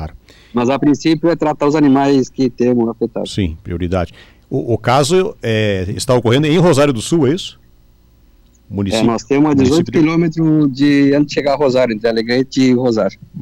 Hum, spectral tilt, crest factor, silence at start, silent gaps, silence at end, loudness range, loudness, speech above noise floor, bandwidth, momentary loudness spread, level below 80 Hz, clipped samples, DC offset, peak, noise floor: none; -6 dB/octave; 12 dB; 0 s; none; 0 s; 4 LU; -14 LUFS; 35 dB; 13 kHz; 9 LU; -40 dBFS; under 0.1%; under 0.1%; -2 dBFS; -48 dBFS